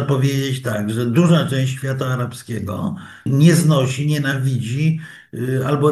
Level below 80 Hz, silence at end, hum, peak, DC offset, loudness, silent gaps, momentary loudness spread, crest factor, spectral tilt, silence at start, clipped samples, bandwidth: -56 dBFS; 0 s; none; 0 dBFS; under 0.1%; -19 LUFS; none; 12 LU; 18 dB; -6.5 dB/octave; 0 s; under 0.1%; 12.5 kHz